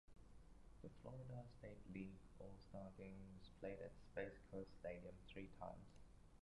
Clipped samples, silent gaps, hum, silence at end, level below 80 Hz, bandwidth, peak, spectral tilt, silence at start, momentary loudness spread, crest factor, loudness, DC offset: under 0.1%; none; none; 0.05 s; -68 dBFS; 11 kHz; -36 dBFS; -7.5 dB/octave; 0.05 s; 9 LU; 20 dB; -57 LUFS; under 0.1%